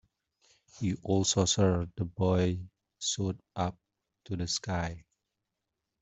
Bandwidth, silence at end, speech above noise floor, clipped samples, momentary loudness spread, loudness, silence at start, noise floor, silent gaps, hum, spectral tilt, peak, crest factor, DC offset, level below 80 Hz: 8.2 kHz; 1.05 s; 56 dB; under 0.1%; 13 LU; -31 LUFS; 0.75 s; -86 dBFS; none; none; -4.5 dB/octave; -12 dBFS; 20 dB; under 0.1%; -58 dBFS